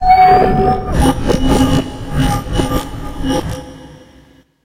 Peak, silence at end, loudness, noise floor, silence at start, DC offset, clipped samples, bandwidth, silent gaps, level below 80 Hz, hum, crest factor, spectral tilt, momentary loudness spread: 0 dBFS; 0.65 s; -14 LUFS; -46 dBFS; 0 s; under 0.1%; under 0.1%; 16 kHz; none; -22 dBFS; none; 14 dB; -6 dB/octave; 16 LU